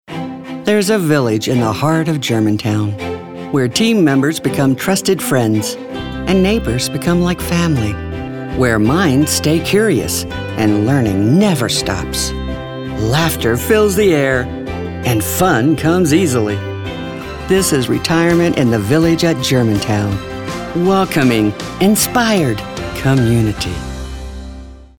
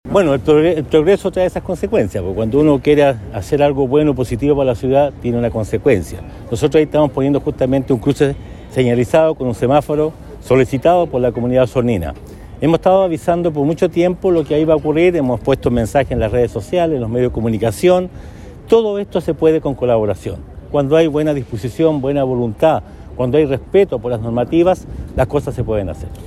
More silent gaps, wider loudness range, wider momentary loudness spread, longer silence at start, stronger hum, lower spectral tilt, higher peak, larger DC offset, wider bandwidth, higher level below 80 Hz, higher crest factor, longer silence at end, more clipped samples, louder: neither; about the same, 2 LU vs 2 LU; first, 12 LU vs 8 LU; about the same, 0.1 s vs 0.05 s; neither; second, -5 dB/octave vs -7.5 dB/octave; about the same, 0 dBFS vs -2 dBFS; first, 0.3% vs under 0.1%; first, 20 kHz vs 13.5 kHz; about the same, -34 dBFS vs -34 dBFS; about the same, 14 dB vs 14 dB; first, 0.15 s vs 0 s; neither; about the same, -15 LUFS vs -15 LUFS